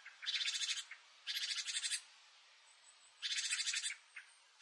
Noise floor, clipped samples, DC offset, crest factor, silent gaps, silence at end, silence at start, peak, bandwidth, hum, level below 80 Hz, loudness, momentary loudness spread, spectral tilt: -65 dBFS; under 0.1%; under 0.1%; 20 dB; none; 0.3 s; 0 s; -24 dBFS; 12 kHz; none; under -90 dBFS; -39 LUFS; 16 LU; 9 dB/octave